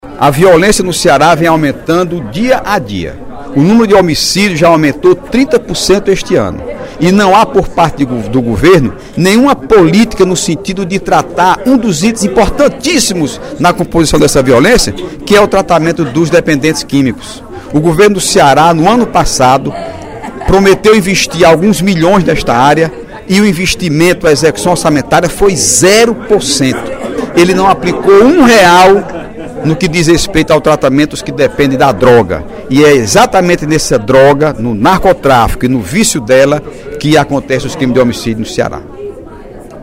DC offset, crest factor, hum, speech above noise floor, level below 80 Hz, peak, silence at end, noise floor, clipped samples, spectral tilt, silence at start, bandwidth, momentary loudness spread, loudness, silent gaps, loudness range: under 0.1%; 8 dB; none; 20 dB; -28 dBFS; 0 dBFS; 0 s; -28 dBFS; 2%; -4.5 dB/octave; 0.05 s; 16.5 kHz; 10 LU; -8 LUFS; none; 3 LU